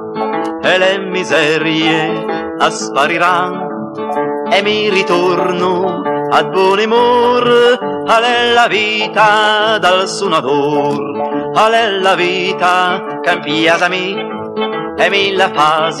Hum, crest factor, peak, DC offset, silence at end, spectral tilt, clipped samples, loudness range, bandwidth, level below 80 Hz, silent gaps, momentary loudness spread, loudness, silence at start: none; 12 dB; 0 dBFS; under 0.1%; 0 s; -4 dB/octave; under 0.1%; 3 LU; 12.5 kHz; -60 dBFS; none; 8 LU; -12 LUFS; 0 s